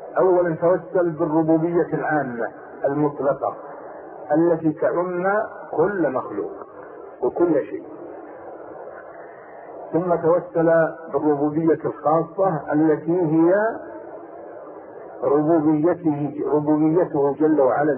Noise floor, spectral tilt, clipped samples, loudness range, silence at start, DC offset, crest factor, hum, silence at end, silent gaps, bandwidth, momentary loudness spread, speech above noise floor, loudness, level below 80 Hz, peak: -40 dBFS; -13.5 dB/octave; under 0.1%; 6 LU; 0 s; under 0.1%; 14 dB; none; 0 s; none; 2.8 kHz; 20 LU; 20 dB; -21 LUFS; -62 dBFS; -6 dBFS